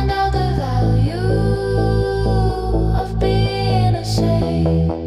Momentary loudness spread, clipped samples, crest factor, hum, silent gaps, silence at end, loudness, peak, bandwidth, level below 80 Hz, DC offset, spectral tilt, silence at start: 2 LU; under 0.1%; 12 dB; none; none; 0 s; -18 LUFS; -6 dBFS; 12 kHz; -24 dBFS; under 0.1%; -7.5 dB/octave; 0 s